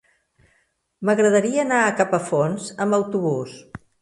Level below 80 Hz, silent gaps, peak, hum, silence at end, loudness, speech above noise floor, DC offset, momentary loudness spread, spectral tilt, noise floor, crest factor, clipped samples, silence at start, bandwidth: -62 dBFS; none; -4 dBFS; none; 0.25 s; -21 LUFS; 46 dB; under 0.1%; 10 LU; -5.5 dB/octave; -66 dBFS; 18 dB; under 0.1%; 1 s; 11.5 kHz